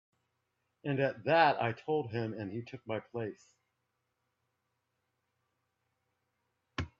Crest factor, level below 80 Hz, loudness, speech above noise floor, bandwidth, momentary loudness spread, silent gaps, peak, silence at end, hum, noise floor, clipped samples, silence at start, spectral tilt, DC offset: 26 dB; -68 dBFS; -33 LUFS; 50 dB; 7.6 kHz; 16 LU; none; -12 dBFS; 0.15 s; none; -83 dBFS; under 0.1%; 0.85 s; -7 dB/octave; under 0.1%